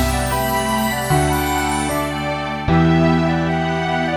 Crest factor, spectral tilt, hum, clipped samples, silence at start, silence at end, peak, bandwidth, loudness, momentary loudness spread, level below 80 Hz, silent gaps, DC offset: 14 dB; -5.5 dB/octave; none; under 0.1%; 0 s; 0 s; -4 dBFS; 19 kHz; -18 LUFS; 6 LU; -30 dBFS; none; under 0.1%